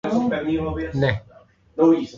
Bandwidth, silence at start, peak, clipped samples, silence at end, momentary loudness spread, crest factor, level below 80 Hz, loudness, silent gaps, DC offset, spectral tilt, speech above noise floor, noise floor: 7.4 kHz; 0.05 s; -4 dBFS; under 0.1%; 0 s; 11 LU; 16 dB; -42 dBFS; -22 LUFS; none; under 0.1%; -8 dB/octave; 31 dB; -51 dBFS